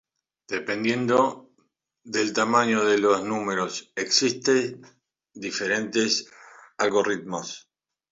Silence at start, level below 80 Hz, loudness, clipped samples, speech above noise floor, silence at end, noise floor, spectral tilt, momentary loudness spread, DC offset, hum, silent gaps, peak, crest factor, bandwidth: 0.5 s; -70 dBFS; -24 LUFS; under 0.1%; 46 dB; 0.5 s; -70 dBFS; -3 dB/octave; 12 LU; under 0.1%; none; none; -6 dBFS; 20 dB; 7.8 kHz